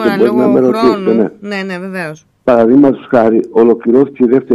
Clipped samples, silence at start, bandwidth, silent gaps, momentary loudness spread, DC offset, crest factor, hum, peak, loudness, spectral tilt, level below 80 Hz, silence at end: under 0.1%; 0 s; 12.5 kHz; none; 12 LU; under 0.1%; 10 dB; none; 0 dBFS; -11 LUFS; -7.5 dB/octave; -52 dBFS; 0 s